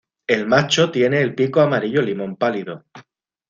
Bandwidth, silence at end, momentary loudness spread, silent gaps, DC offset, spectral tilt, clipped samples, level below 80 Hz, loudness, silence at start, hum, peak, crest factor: 7.6 kHz; 0.5 s; 9 LU; none; under 0.1%; -5 dB/octave; under 0.1%; -60 dBFS; -18 LUFS; 0.3 s; none; -2 dBFS; 18 dB